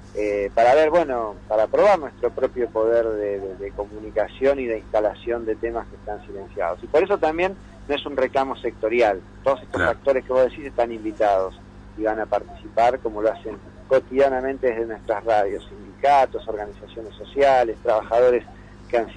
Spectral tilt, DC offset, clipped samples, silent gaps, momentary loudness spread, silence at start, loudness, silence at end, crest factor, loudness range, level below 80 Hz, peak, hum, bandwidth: -6 dB/octave; under 0.1%; under 0.1%; none; 14 LU; 0 s; -22 LUFS; 0 s; 14 dB; 4 LU; -46 dBFS; -8 dBFS; 50 Hz at -45 dBFS; 10 kHz